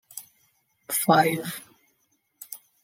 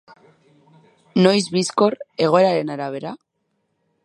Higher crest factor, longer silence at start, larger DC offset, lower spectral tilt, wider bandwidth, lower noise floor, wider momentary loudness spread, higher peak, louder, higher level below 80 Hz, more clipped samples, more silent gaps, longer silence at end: about the same, 24 dB vs 20 dB; second, 0.15 s vs 1.15 s; neither; second, -4 dB/octave vs -5.5 dB/octave; first, 16.5 kHz vs 11.5 kHz; about the same, -71 dBFS vs -71 dBFS; first, 22 LU vs 14 LU; second, -6 dBFS vs -2 dBFS; second, -23 LUFS vs -19 LUFS; second, -76 dBFS vs -70 dBFS; neither; neither; second, 0.3 s vs 0.9 s